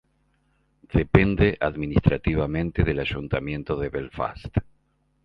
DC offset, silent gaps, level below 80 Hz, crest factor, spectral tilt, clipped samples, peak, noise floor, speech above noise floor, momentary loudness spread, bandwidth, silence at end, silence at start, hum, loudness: under 0.1%; none; -36 dBFS; 24 dB; -9.5 dB/octave; under 0.1%; 0 dBFS; -67 dBFS; 44 dB; 10 LU; 5.6 kHz; 0.65 s; 0.9 s; none; -24 LUFS